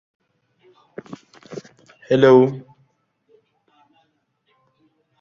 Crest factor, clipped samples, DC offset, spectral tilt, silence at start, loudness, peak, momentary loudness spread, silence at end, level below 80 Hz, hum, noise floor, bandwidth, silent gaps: 22 dB; under 0.1%; under 0.1%; -7.5 dB/octave; 1.5 s; -15 LUFS; -2 dBFS; 28 LU; 2.6 s; -64 dBFS; none; -67 dBFS; 7 kHz; none